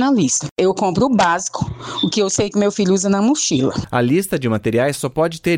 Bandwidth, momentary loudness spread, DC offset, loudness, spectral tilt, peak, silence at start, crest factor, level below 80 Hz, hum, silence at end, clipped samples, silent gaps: 16.5 kHz; 5 LU; under 0.1%; -17 LUFS; -4.5 dB/octave; -6 dBFS; 0 s; 12 dB; -46 dBFS; none; 0 s; under 0.1%; 0.51-0.56 s